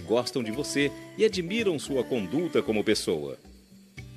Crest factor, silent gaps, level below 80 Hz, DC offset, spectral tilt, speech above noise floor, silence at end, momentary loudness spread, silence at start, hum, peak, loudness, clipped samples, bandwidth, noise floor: 18 dB; none; -58 dBFS; under 0.1%; -4.5 dB/octave; 23 dB; 0 s; 6 LU; 0 s; none; -10 dBFS; -28 LUFS; under 0.1%; 14 kHz; -50 dBFS